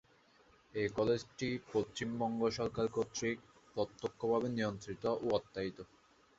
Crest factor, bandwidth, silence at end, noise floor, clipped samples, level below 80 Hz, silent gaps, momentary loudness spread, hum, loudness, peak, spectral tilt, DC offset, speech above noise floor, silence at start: 20 dB; 8 kHz; 0.55 s; -67 dBFS; under 0.1%; -66 dBFS; none; 9 LU; none; -38 LUFS; -18 dBFS; -5 dB/octave; under 0.1%; 31 dB; 0.75 s